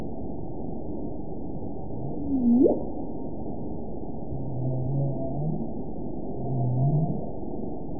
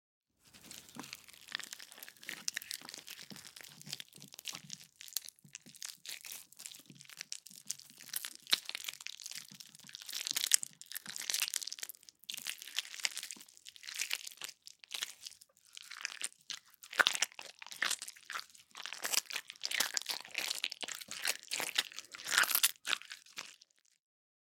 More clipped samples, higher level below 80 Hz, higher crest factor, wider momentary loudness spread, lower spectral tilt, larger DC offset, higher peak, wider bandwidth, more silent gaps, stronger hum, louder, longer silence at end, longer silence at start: neither; first, -44 dBFS vs under -90 dBFS; second, 18 dB vs 38 dB; second, 13 LU vs 19 LU; first, -19 dB/octave vs 2 dB/octave; first, 3% vs under 0.1%; second, -10 dBFS vs -4 dBFS; second, 1 kHz vs 17 kHz; neither; neither; first, -30 LUFS vs -37 LUFS; second, 0 s vs 0.95 s; second, 0 s vs 0.45 s